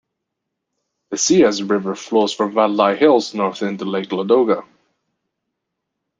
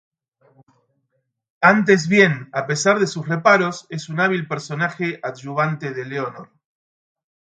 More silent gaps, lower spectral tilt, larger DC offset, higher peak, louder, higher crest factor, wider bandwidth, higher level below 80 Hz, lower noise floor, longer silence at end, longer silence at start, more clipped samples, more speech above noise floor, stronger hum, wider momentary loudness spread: neither; about the same, -4 dB/octave vs -5 dB/octave; neither; about the same, -2 dBFS vs 0 dBFS; about the same, -17 LUFS vs -19 LUFS; about the same, 18 dB vs 20 dB; about the same, 9.4 kHz vs 9.2 kHz; about the same, -64 dBFS vs -66 dBFS; first, -79 dBFS vs -72 dBFS; first, 1.55 s vs 1.1 s; second, 1.1 s vs 1.6 s; neither; first, 62 dB vs 53 dB; neither; second, 9 LU vs 12 LU